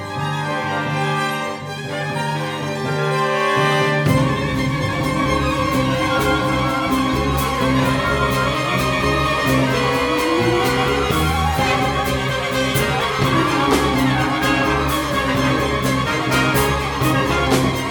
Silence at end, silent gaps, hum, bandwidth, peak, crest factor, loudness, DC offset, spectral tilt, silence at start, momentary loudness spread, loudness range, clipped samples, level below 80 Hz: 0 s; none; none; over 20 kHz; -2 dBFS; 16 dB; -18 LUFS; under 0.1%; -5 dB/octave; 0 s; 5 LU; 2 LU; under 0.1%; -32 dBFS